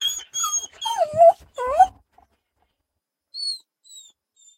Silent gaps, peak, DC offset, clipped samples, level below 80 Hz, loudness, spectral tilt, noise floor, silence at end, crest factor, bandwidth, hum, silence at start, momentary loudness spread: none; -4 dBFS; under 0.1%; under 0.1%; -58 dBFS; -20 LUFS; 0 dB/octave; -82 dBFS; 0.55 s; 20 dB; 16 kHz; none; 0 s; 13 LU